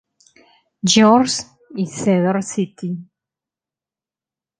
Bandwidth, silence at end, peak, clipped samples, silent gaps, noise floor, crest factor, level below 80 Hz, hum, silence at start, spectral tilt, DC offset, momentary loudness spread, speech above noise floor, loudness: 10 kHz; 1.55 s; 0 dBFS; under 0.1%; none; under -90 dBFS; 20 dB; -62 dBFS; none; 0.85 s; -4.5 dB/octave; under 0.1%; 16 LU; over 74 dB; -17 LUFS